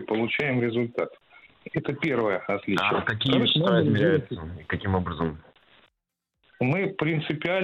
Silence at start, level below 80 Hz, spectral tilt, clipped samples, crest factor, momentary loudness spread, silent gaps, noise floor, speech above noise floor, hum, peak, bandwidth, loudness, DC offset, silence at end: 0 s; -54 dBFS; -7.5 dB/octave; under 0.1%; 22 dB; 11 LU; none; -82 dBFS; 57 dB; none; -4 dBFS; 9.8 kHz; -25 LUFS; under 0.1%; 0 s